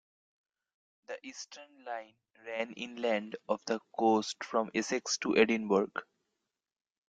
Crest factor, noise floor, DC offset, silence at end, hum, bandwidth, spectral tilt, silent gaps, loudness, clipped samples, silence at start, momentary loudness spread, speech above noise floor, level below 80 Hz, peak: 24 dB; -88 dBFS; under 0.1%; 1.05 s; none; 9.2 kHz; -3.5 dB/octave; none; -33 LUFS; under 0.1%; 1.1 s; 18 LU; 54 dB; -76 dBFS; -10 dBFS